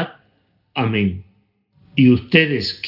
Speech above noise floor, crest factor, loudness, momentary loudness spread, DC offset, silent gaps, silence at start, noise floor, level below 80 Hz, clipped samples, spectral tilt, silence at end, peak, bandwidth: 46 dB; 20 dB; -17 LUFS; 15 LU; under 0.1%; none; 0 s; -62 dBFS; -56 dBFS; under 0.1%; -7.5 dB/octave; 0 s; 0 dBFS; 5.8 kHz